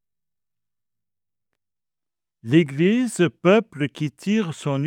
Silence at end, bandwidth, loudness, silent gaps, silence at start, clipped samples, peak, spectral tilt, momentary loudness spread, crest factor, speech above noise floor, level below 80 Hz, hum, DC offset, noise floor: 0 s; 13.5 kHz; -21 LUFS; none; 2.45 s; under 0.1%; -4 dBFS; -6.5 dB/octave; 10 LU; 20 dB; over 70 dB; -72 dBFS; none; under 0.1%; under -90 dBFS